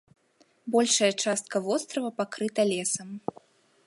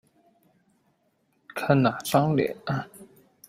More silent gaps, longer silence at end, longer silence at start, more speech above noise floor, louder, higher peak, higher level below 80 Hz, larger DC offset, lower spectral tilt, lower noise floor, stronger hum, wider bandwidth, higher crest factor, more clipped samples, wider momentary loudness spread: neither; first, 0.7 s vs 0.45 s; second, 0.65 s vs 1.55 s; second, 38 dB vs 46 dB; about the same, -27 LUFS vs -25 LUFS; second, -10 dBFS vs -6 dBFS; second, -78 dBFS vs -64 dBFS; neither; second, -2.5 dB/octave vs -6.5 dB/octave; second, -65 dBFS vs -70 dBFS; neither; second, 11.5 kHz vs 16 kHz; about the same, 18 dB vs 22 dB; neither; about the same, 15 LU vs 13 LU